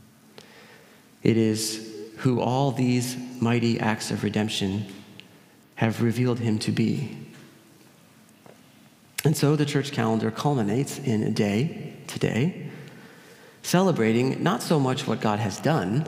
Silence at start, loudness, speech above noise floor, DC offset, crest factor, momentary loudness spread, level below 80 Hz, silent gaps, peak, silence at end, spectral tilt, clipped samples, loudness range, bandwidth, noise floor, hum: 0.4 s; -25 LUFS; 30 dB; under 0.1%; 22 dB; 14 LU; -70 dBFS; none; -4 dBFS; 0 s; -6 dB/octave; under 0.1%; 3 LU; 16 kHz; -54 dBFS; none